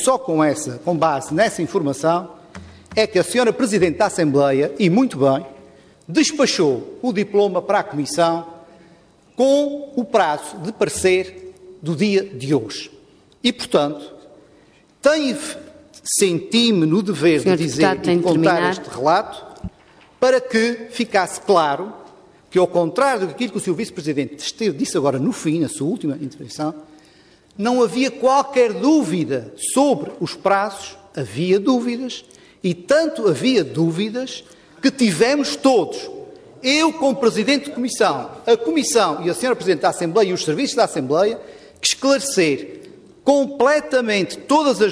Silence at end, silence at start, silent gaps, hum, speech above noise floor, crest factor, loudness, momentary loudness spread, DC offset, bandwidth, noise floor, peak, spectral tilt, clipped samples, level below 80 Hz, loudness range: 0 s; 0 s; none; none; 34 dB; 16 dB; -19 LUFS; 11 LU; under 0.1%; 11 kHz; -52 dBFS; -2 dBFS; -4.5 dB/octave; under 0.1%; -56 dBFS; 4 LU